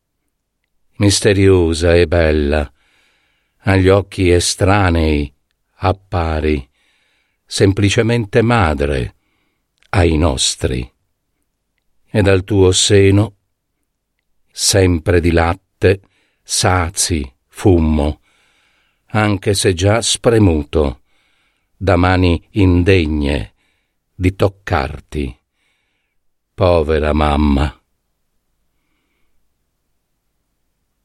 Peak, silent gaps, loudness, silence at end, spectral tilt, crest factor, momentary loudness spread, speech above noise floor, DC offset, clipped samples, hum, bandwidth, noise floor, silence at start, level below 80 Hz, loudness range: 0 dBFS; none; -15 LUFS; 3.35 s; -5 dB/octave; 16 dB; 10 LU; 57 dB; under 0.1%; under 0.1%; none; 13 kHz; -70 dBFS; 1 s; -28 dBFS; 4 LU